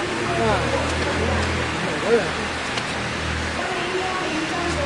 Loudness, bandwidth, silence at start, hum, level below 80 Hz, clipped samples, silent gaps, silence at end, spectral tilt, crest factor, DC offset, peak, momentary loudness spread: -22 LUFS; 11.5 kHz; 0 s; none; -40 dBFS; under 0.1%; none; 0 s; -4.5 dB/octave; 18 dB; under 0.1%; -6 dBFS; 4 LU